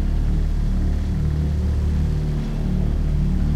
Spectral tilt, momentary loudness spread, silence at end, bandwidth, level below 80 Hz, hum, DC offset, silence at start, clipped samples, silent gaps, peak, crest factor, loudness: -8.5 dB/octave; 2 LU; 0 s; 8.4 kHz; -22 dBFS; none; under 0.1%; 0 s; under 0.1%; none; -10 dBFS; 10 dB; -23 LUFS